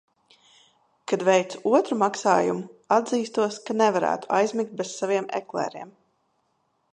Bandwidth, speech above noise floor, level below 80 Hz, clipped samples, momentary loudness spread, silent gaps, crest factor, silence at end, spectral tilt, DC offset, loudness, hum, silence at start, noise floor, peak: 11 kHz; 48 dB; -76 dBFS; under 0.1%; 9 LU; none; 20 dB; 1.05 s; -4.5 dB/octave; under 0.1%; -24 LUFS; none; 1.1 s; -71 dBFS; -4 dBFS